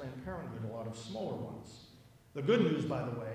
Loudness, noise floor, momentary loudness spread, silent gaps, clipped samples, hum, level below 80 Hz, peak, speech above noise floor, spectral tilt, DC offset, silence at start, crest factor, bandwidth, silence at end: -36 LUFS; -58 dBFS; 18 LU; none; under 0.1%; none; -62 dBFS; -18 dBFS; 22 dB; -7 dB/octave; under 0.1%; 0 s; 20 dB; 15.5 kHz; 0 s